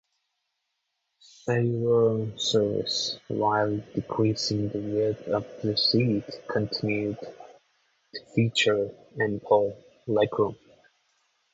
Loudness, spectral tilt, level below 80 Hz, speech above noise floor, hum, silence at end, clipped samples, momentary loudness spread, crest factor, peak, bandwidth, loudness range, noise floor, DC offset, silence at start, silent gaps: -26 LUFS; -5.5 dB/octave; -62 dBFS; 54 dB; none; 1 s; under 0.1%; 9 LU; 18 dB; -8 dBFS; 8 kHz; 2 LU; -80 dBFS; under 0.1%; 1.45 s; none